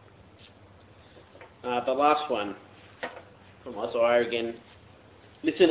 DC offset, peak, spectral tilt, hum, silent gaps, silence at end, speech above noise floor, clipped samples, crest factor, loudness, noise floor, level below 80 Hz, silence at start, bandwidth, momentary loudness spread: under 0.1%; -8 dBFS; -8.5 dB/octave; none; none; 0 s; 28 dB; under 0.1%; 22 dB; -28 LUFS; -54 dBFS; -64 dBFS; 1.15 s; 4 kHz; 21 LU